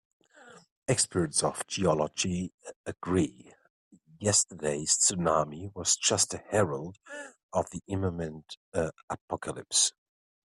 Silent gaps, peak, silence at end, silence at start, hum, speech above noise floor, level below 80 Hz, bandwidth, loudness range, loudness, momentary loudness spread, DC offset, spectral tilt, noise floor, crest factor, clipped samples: 0.71-0.82 s, 2.54-2.58 s, 2.76-2.84 s, 3.70-3.91 s, 7.43-7.49 s, 8.57-8.72 s, 9.03-9.08 s, 9.21-9.28 s; -10 dBFS; 0.55 s; 0.45 s; none; 25 dB; -62 dBFS; 14 kHz; 5 LU; -28 LUFS; 16 LU; under 0.1%; -3 dB/octave; -55 dBFS; 20 dB; under 0.1%